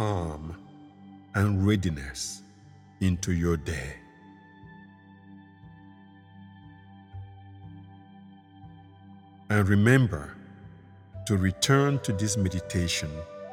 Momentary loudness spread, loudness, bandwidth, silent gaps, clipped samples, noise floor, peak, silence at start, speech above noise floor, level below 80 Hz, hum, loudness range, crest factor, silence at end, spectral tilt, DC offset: 26 LU; -27 LUFS; 16 kHz; none; under 0.1%; -53 dBFS; -6 dBFS; 0 s; 27 dB; -48 dBFS; none; 23 LU; 24 dB; 0 s; -5.5 dB/octave; under 0.1%